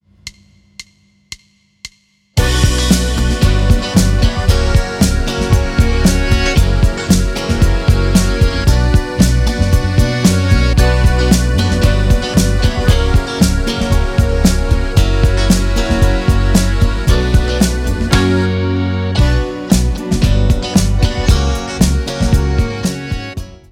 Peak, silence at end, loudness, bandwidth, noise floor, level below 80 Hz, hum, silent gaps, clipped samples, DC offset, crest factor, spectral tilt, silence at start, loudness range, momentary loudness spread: 0 dBFS; 0.15 s; -14 LUFS; 16.5 kHz; -52 dBFS; -16 dBFS; none; none; under 0.1%; under 0.1%; 12 dB; -5.5 dB/octave; 0.25 s; 2 LU; 5 LU